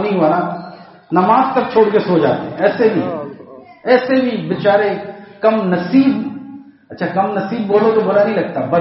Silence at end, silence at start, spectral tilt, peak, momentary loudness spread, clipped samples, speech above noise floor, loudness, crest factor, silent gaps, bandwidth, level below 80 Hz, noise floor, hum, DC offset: 0 s; 0 s; -5.5 dB/octave; 0 dBFS; 14 LU; under 0.1%; 24 dB; -15 LUFS; 16 dB; none; 5.8 kHz; -60 dBFS; -38 dBFS; none; under 0.1%